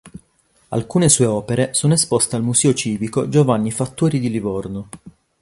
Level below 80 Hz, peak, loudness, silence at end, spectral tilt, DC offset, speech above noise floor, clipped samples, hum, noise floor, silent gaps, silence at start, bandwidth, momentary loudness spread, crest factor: -48 dBFS; -2 dBFS; -17 LUFS; 0.3 s; -5 dB/octave; under 0.1%; 42 dB; under 0.1%; none; -59 dBFS; none; 0.05 s; 11.5 kHz; 11 LU; 18 dB